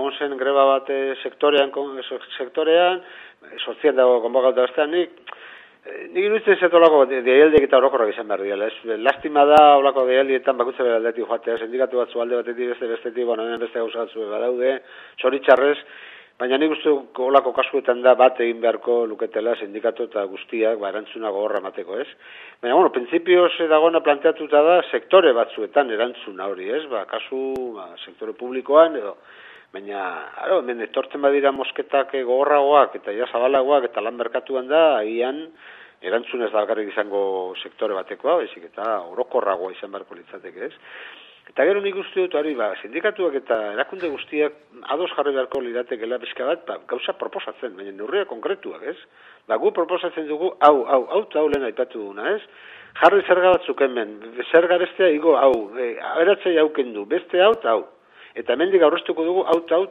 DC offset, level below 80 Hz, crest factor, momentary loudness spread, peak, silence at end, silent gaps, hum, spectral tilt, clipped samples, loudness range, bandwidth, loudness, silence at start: under 0.1%; -64 dBFS; 20 dB; 15 LU; 0 dBFS; 0 s; none; none; -6 dB/octave; under 0.1%; 8 LU; 5 kHz; -20 LUFS; 0 s